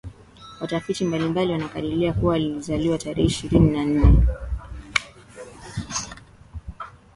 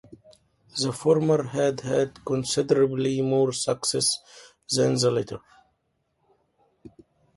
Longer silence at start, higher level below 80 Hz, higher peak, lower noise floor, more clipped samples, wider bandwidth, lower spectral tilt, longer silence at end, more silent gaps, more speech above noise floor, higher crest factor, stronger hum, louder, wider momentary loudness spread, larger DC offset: about the same, 0.05 s vs 0.1 s; first, -28 dBFS vs -62 dBFS; first, 0 dBFS vs -6 dBFS; second, -45 dBFS vs -73 dBFS; neither; about the same, 11.5 kHz vs 11.5 kHz; first, -6 dB/octave vs -4.5 dB/octave; second, 0.25 s vs 0.5 s; neither; second, 25 dB vs 49 dB; about the same, 22 dB vs 20 dB; neither; about the same, -23 LUFS vs -24 LUFS; first, 23 LU vs 8 LU; neither